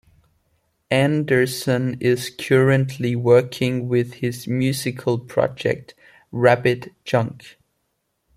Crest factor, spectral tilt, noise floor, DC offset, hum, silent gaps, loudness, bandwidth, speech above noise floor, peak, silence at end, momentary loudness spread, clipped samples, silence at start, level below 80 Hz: 18 dB; -6 dB/octave; -73 dBFS; under 0.1%; none; none; -20 LUFS; 15.5 kHz; 53 dB; -2 dBFS; 0.85 s; 8 LU; under 0.1%; 0.9 s; -58 dBFS